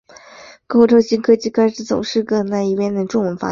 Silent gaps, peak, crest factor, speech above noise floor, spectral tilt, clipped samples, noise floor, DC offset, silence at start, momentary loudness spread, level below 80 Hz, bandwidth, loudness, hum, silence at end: none; -2 dBFS; 16 dB; 26 dB; -6 dB/octave; under 0.1%; -42 dBFS; under 0.1%; 0.4 s; 7 LU; -56 dBFS; 7.4 kHz; -16 LUFS; none; 0 s